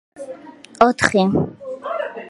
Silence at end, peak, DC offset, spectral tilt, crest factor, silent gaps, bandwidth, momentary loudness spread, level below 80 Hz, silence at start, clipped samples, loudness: 0 s; 0 dBFS; under 0.1%; -5.5 dB/octave; 20 dB; none; 11.5 kHz; 20 LU; -50 dBFS; 0.15 s; under 0.1%; -18 LUFS